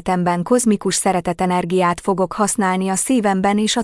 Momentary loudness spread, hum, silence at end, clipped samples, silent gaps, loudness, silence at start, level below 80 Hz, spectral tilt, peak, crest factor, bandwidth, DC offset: 3 LU; none; 0 s; under 0.1%; none; -18 LUFS; 0.05 s; -48 dBFS; -4.5 dB/octave; -4 dBFS; 14 dB; 12 kHz; under 0.1%